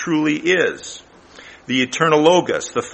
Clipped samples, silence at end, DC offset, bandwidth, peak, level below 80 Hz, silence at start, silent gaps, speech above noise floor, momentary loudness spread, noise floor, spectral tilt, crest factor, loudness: under 0.1%; 0 s; under 0.1%; 8.8 kHz; 0 dBFS; -58 dBFS; 0 s; none; 25 dB; 20 LU; -42 dBFS; -4 dB/octave; 18 dB; -17 LUFS